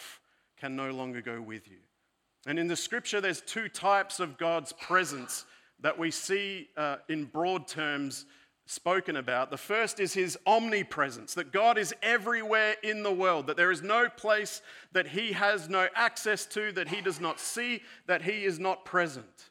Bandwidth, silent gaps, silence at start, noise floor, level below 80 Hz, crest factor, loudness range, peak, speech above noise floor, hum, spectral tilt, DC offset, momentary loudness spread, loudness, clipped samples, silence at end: 17 kHz; none; 0 s; -77 dBFS; -82 dBFS; 20 dB; 5 LU; -12 dBFS; 46 dB; none; -3 dB/octave; under 0.1%; 11 LU; -30 LUFS; under 0.1%; 0.05 s